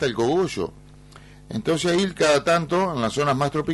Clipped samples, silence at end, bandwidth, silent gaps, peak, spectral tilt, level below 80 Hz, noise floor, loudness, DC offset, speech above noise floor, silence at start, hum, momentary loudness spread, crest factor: under 0.1%; 0 s; 11.5 kHz; none; -8 dBFS; -5 dB/octave; -50 dBFS; -46 dBFS; -22 LUFS; under 0.1%; 24 dB; 0 s; 50 Hz at -50 dBFS; 10 LU; 14 dB